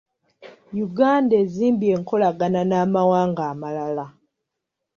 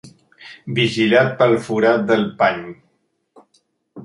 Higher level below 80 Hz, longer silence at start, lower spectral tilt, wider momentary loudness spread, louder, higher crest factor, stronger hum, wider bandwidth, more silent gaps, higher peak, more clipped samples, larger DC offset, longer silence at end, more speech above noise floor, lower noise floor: about the same, -64 dBFS vs -60 dBFS; first, 0.4 s vs 0.05 s; first, -8 dB/octave vs -6 dB/octave; about the same, 11 LU vs 13 LU; second, -21 LUFS vs -17 LUFS; about the same, 16 dB vs 18 dB; neither; second, 7.2 kHz vs 11.5 kHz; neither; second, -4 dBFS vs 0 dBFS; neither; neither; first, 0.85 s vs 0 s; first, 62 dB vs 50 dB; first, -82 dBFS vs -67 dBFS